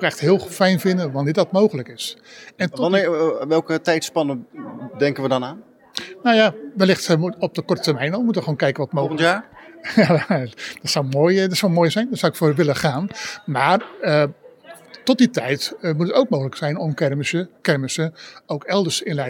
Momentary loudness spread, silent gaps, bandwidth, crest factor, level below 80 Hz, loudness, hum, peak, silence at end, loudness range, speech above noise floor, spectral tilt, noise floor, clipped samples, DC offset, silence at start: 11 LU; none; 18 kHz; 18 dB; -66 dBFS; -20 LUFS; none; -2 dBFS; 0 s; 3 LU; 24 dB; -5.5 dB/octave; -43 dBFS; under 0.1%; under 0.1%; 0 s